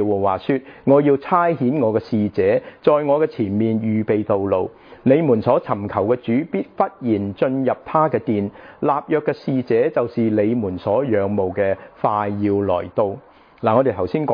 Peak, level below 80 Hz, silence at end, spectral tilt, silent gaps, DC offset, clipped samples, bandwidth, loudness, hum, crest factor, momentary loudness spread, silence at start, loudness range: -2 dBFS; -58 dBFS; 0 s; -10.5 dB/octave; none; under 0.1%; under 0.1%; 5.2 kHz; -19 LUFS; none; 18 dB; 6 LU; 0 s; 3 LU